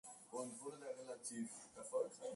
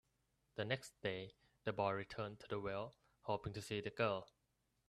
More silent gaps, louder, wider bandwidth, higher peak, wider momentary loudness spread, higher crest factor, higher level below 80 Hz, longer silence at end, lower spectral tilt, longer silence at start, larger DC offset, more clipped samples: neither; second, -49 LUFS vs -44 LUFS; second, 11.5 kHz vs 13.5 kHz; second, -30 dBFS vs -24 dBFS; second, 7 LU vs 10 LU; about the same, 18 dB vs 22 dB; second, -90 dBFS vs -72 dBFS; second, 0 s vs 0.65 s; second, -3.5 dB/octave vs -5.5 dB/octave; second, 0.05 s vs 0.55 s; neither; neither